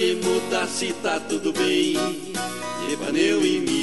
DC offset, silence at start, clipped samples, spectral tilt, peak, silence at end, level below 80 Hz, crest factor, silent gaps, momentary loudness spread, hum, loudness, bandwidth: 0.6%; 0 s; under 0.1%; -3.5 dB/octave; -6 dBFS; 0 s; -58 dBFS; 16 dB; none; 8 LU; none; -23 LUFS; 12 kHz